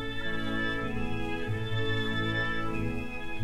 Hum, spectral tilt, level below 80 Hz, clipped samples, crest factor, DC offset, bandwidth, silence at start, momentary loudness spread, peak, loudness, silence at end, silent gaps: none; -6 dB/octave; -44 dBFS; under 0.1%; 12 dB; under 0.1%; 13 kHz; 0 s; 4 LU; -18 dBFS; -32 LUFS; 0 s; none